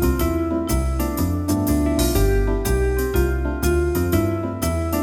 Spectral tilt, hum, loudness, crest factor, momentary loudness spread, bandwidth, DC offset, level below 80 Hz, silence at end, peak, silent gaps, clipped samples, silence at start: -6 dB/octave; none; -21 LUFS; 14 dB; 4 LU; 19 kHz; 0.1%; -24 dBFS; 0 s; -6 dBFS; none; under 0.1%; 0 s